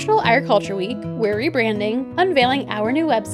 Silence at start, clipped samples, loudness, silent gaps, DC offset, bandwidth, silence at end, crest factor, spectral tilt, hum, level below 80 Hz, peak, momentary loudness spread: 0 s; under 0.1%; -19 LUFS; none; under 0.1%; 12.5 kHz; 0 s; 16 dB; -5.5 dB/octave; none; -56 dBFS; -2 dBFS; 7 LU